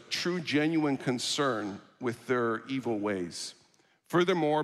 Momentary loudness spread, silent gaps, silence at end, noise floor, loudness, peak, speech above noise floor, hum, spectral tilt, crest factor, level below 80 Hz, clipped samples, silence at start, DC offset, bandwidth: 10 LU; none; 0 s; -66 dBFS; -30 LUFS; -14 dBFS; 36 dB; none; -4.5 dB/octave; 18 dB; -76 dBFS; under 0.1%; 0 s; under 0.1%; 13.5 kHz